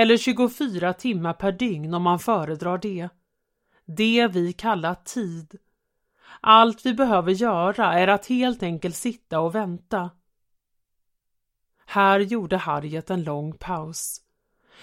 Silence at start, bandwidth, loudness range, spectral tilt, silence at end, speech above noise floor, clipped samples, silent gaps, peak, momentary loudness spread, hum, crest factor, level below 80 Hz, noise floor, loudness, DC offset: 0 s; 16 kHz; 6 LU; -5 dB/octave; 0.65 s; 53 dB; under 0.1%; none; 0 dBFS; 12 LU; none; 22 dB; -58 dBFS; -75 dBFS; -23 LUFS; under 0.1%